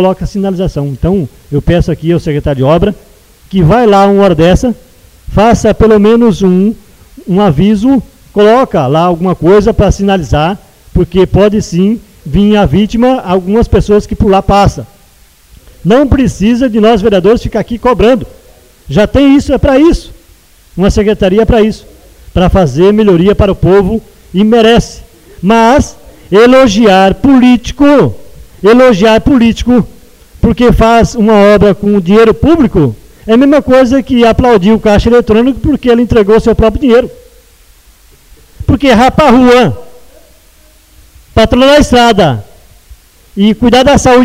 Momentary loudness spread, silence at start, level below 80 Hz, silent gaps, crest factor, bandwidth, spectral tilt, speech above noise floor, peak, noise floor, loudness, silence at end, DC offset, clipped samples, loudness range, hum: 9 LU; 0 s; -22 dBFS; none; 8 dB; 15.5 kHz; -6.5 dB/octave; 36 dB; 0 dBFS; -42 dBFS; -7 LUFS; 0 s; under 0.1%; 0.5%; 3 LU; none